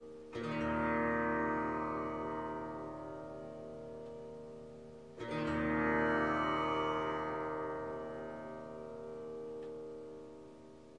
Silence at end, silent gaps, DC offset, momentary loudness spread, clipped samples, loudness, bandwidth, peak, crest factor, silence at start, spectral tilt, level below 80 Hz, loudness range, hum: 0 s; none; under 0.1%; 17 LU; under 0.1%; -38 LUFS; 10.5 kHz; -22 dBFS; 16 dB; 0 s; -7 dB/octave; -62 dBFS; 9 LU; none